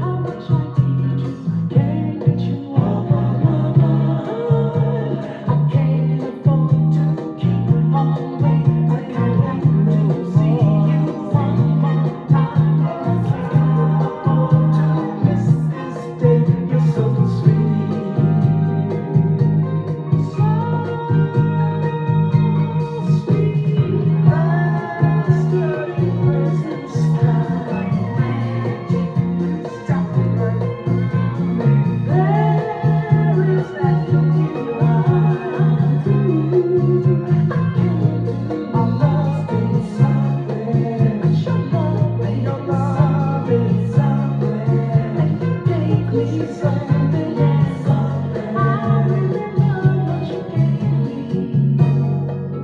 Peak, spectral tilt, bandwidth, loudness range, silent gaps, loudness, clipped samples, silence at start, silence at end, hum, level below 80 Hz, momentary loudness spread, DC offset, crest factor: 0 dBFS; -10 dB/octave; 4.9 kHz; 2 LU; none; -18 LUFS; under 0.1%; 0 s; 0 s; none; -46 dBFS; 5 LU; under 0.1%; 16 dB